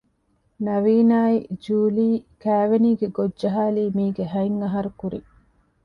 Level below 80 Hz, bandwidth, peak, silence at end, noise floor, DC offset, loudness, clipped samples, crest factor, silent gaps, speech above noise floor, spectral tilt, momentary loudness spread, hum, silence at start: -58 dBFS; 5.4 kHz; -8 dBFS; 0.65 s; -66 dBFS; under 0.1%; -22 LUFS; under 0.1%; 14 dB; none; 46 dB; -9.5 dB/octave; 10 LU; none; 0.6 s